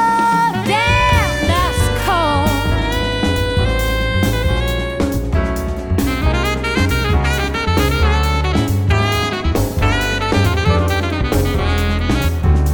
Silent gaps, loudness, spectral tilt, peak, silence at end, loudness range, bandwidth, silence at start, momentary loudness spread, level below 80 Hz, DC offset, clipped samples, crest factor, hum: none; -16 LUFS; -5.5 dB/octave; -2 dBFS; 0 s; 2 LU; 19 kHz; 0 s; 4 LU; -20 dBFS; under 0.1%; under 0.1%; 14 dB; none